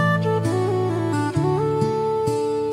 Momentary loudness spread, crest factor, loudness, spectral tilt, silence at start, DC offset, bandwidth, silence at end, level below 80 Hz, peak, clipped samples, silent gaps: 2 LU; 12 dB; -22 LUFS; -7 dB/octave; 0 s; under 0.1%; 14 kHz; 0 s; -54 dBFS; -8 dBFS; under 0.1%; none